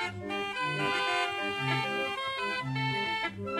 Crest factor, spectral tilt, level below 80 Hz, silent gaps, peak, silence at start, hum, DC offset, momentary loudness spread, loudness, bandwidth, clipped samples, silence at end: 14 dB; -4.5 dB/octave; -66 dBFS; none; -18 dBFS; 0 s; none; under 0.1%; 4 LU; -31 LUFS; 14.5 kHz; under 0.1%; 0 s